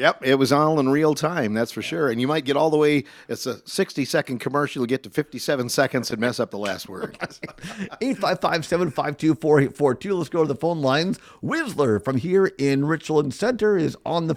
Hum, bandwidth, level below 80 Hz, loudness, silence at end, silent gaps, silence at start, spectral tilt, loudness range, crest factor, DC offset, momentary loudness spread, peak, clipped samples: none; 16 kHz; -60 dBFS; -22 LUFS; 0 s; none; 0 s; -5.5 dB/octave; 4 LU; 20 dB; under 0.1%; 11 LU; -2 dBFS; under 0.1%